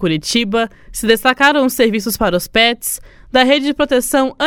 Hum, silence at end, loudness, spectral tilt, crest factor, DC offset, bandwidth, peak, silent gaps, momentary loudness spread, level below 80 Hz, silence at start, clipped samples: none; 0 s; -14 LUFS; -3 dB/octave; 14 dB; under 0.1%; 18 kHz; 0 dBFS; none; 9 LU; -40 dBFS; 0 s; under 0.1%